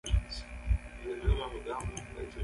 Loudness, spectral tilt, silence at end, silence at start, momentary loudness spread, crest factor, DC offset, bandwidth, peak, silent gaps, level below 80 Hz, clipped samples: -37 LUFS; -5.5 dB/octave; 0 s; 0.05 s; 9 LU; 18 dB; under 0.1%; 11.5 kHz; -16 dBFS; none; -36 dBFS; under 0.1%